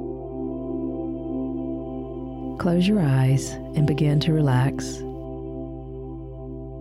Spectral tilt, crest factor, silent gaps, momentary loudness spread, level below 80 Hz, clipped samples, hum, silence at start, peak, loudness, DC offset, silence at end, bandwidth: -7 dB/octave; 14 dB; none; 16 LU; -42 dBFS; under 0.1%; none; 0 s; -10 dBFS; -25 LUFS; under 0.1%; 0 s; 12 kHz